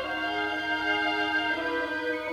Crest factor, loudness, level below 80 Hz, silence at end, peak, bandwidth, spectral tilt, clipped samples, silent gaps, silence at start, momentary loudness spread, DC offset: 14 dB; -28 LUFS; -60 dBFS; 0 s; -14 dBFS; 16 kHz; -3.5 dB/octave; under 0.1%; none; 0 s; 4 LU; under 0.1%